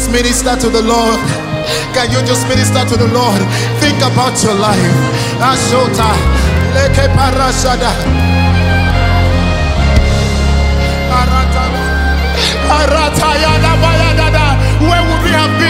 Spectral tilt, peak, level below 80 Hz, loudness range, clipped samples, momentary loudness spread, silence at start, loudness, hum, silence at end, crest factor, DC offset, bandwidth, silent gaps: -5 dB/octave; 0 dBFS; -16 dBFS; 2 LU; under 0.1%; 3 LU; 0 s; -11 LUFS; none; 0 s; 10 dB; under 0.1%; 16.5 kHz; none